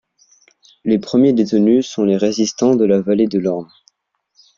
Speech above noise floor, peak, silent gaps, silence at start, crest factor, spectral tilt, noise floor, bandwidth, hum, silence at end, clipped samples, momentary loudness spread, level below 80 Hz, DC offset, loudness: 53 dB; -2 dBFS; none; 0.85 s; 14 dB; -6 dB/octave; -68 dBFS; 7.4 kHz; none; 0.95 s; under 0.1%; 6 LU; -58 dBFS; under 0.1%; -16 LUFS